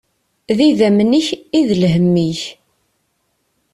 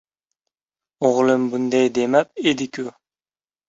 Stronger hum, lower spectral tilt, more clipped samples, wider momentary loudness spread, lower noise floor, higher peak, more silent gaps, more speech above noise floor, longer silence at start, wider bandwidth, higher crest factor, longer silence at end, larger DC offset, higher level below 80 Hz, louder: neither; first, -6.5 dB/octave vs -5 dB/octave; neither; about the same, 9 LU vs 11 LU; second, -66 dBFS vs under -90 dBFS; about the same, -2 dBFS vs -2 dBFS; neither; second, 53 dB vs over 71 dB; second, 0.5 s vs 1 s; first, 11.5 kHz vs 8 kHz; about the same, 14 dB vs 18 dB; first, 1.2 s vs 0.8 s; neither; first, -52 dBFS vs -64 dBFS; first, -14 LUFS vs -19 LUFS